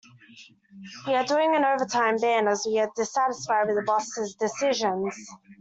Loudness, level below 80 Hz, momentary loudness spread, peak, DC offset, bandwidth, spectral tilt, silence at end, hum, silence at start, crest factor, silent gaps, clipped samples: -25 LUFS; -72 dBFS; 10 LU; -10 dBFS; under 0.1%; 8.2 kHz; -3 dB/octave; 0.05 s; none; 0.35 s; 16 dB; none; under 0.1%